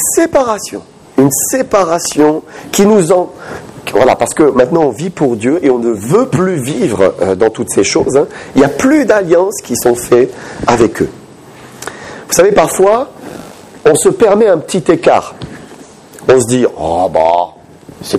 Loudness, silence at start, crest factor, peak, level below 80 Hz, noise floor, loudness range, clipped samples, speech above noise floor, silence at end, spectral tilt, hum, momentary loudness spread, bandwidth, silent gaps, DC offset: -11 LUFS; 0 s; 12 dB; 0 dBFS; -42 dBFS; -35 dBFS; 2 LU; under 0.1%; 25 dB; 0 s; -4.5 dB/octave; none; 15 LU; 15.5 kHz; none; under 0.1%